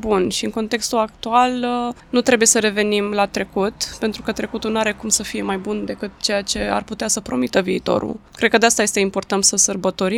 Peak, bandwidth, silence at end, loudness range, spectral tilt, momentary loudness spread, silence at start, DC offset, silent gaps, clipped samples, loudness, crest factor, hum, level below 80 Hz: 0 dBFS; 17.5 kHz; 0 s; 4 LU; -2.5 dB/octave; 10 LU; 0 s; under 0.1%; none; under 0.1%; -19 LUFS; 18 dB; none; -46 dBFS